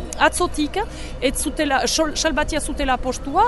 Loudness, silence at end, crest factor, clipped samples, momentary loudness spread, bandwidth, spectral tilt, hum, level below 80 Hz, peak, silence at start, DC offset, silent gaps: -21 LUFS; 0 s; 18 dB; under 0.1%; 6 LU; 12 kHz; -3 dB/octave; none; -32 dBFS; -2 dBFS; 0 s; under 0.1%; none